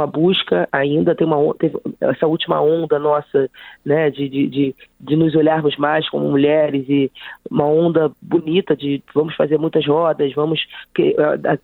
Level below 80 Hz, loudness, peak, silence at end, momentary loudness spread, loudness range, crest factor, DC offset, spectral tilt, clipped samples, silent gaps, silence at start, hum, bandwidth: -58 dBFS; -17 LUFS; -2 dBFS; 0.05 s; 6 LU; 1 LU; 16 dB; under 0.1%; -9 dB/octave; under 0.1%; none; 0 s; none; 4.2 kHz